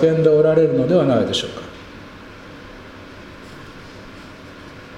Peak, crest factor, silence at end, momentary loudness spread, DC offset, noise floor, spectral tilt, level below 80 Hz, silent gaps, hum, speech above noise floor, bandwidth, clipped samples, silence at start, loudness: -2 dBFS; 18 dB; 0 s; 24 LU; under 0.1%; -38 dBFS; -6.5 dB/octave; -50 dBFS; none; none; 23 dB; 10.5 kHz; under 0.1%; 0 s; -16 LUFS